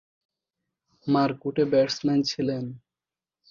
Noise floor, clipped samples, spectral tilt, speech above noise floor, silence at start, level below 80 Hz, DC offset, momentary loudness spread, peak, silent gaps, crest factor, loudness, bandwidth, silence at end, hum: under -90 dBFS; under 0.1%; -6 dB/octave; over 66 dB; 1.05 s; -66 dBFS; under 0.1%; 11 LU; -10 dBFS; none; 18 dB; -25 LUFS; 7.4 kHz; 0.75 s; none